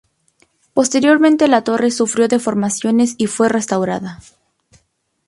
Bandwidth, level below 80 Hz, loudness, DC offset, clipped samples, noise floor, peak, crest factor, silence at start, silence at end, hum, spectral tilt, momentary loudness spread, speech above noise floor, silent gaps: 11.5 kHz; -58 dBFS; -15 LUFS; under 0.1%; under 0.1%; -65 dBFS; 0 dBFS; 16 dB; 0.75 s; 1.1 s; none; -4.5 dB/octave; 8 LU; 50 dB; none